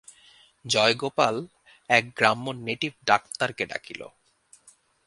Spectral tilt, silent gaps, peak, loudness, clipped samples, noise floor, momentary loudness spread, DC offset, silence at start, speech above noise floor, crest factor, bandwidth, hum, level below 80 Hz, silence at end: -3 dB/octave; none; 0 dBFS; -24 LUFS; under 0.1%; -59 dBFS; 19 LU; under 0.1%; 0.65 s; 34 dB; 26 dB; 11.5 kHz; none; -68 dBFS; 1 s